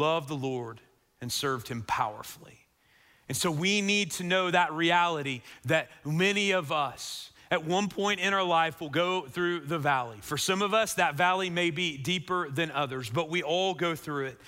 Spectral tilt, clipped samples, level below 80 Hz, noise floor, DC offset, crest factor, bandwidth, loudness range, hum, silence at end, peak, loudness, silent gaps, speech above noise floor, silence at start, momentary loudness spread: -4 dB/octave; under 0.1%; -66 dBFS; -64 dBFS; under 0.1%; 18 dB; 16 kHz; 4 LU; none; 0 s; -12 dBFS; -28 LUFS; none; 35 dB; 0 s; 10 LU